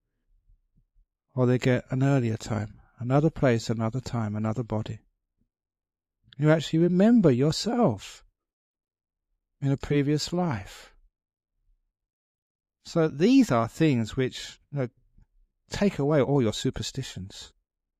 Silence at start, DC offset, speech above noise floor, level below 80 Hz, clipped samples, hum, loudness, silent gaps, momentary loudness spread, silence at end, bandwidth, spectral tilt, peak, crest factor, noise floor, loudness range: 1.35 s; under 0.1%; 52 dB; -54 dBFS; under 0.1%; none; -25 LUFS; 8.53-8.74 s, 12.13-12.59 s; 17 LU; 0.55 s; 14 kHz; -6.5 dB/octave; -6 dBFS; 20 dB; -77 dBFS; 6 LU